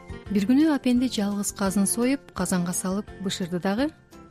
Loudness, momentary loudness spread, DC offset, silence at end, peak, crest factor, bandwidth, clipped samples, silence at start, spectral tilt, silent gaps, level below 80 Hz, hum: -25 LUFS; 9 LU; under 0.1%; 0.05 s; -12 dBFS; 14 dB; 15.5 kHz; under 0.1%; 0 s; -5 dB/octave; none; -50 dBFS; none